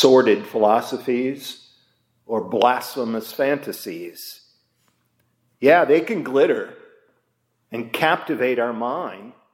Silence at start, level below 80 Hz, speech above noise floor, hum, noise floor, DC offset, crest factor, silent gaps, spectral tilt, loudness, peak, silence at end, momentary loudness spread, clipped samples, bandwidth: 0 s; -76 dBFS; 50 dB; none; -70 dBFS; under 0.1%; 20 dB; none; -4.5 dB/octave; -20 LUFS; -2 dBFS; 0.25 s; 18 LU; under 0.1%; 16.5 kHz